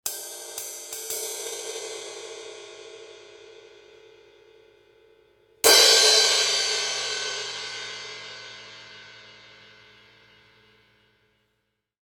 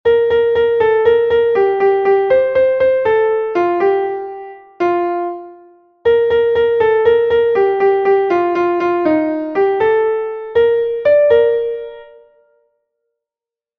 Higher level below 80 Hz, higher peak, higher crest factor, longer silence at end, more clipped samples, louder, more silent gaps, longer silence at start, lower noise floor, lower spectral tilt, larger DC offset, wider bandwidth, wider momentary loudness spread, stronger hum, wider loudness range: second, -74 dBFS vs -50 dBFS; about the same, -2 dBFS vs -2 dBFS; first, 26 dB vs 12 dB; first, 2.75 s vs 1.75 s; neither; second, -21 LUFS vs -14 LUFS; neither; about the same, 0.05 s vs 0.05 s; second, -77 dBFS vs -89 dBFS; second, 2 dB/octave vs -7 dB/octave; neither; first, 18 kHz vs 5.2 kHz; first, 28 LU vs 8 LU; neither; first, 21 LU vs 4 LU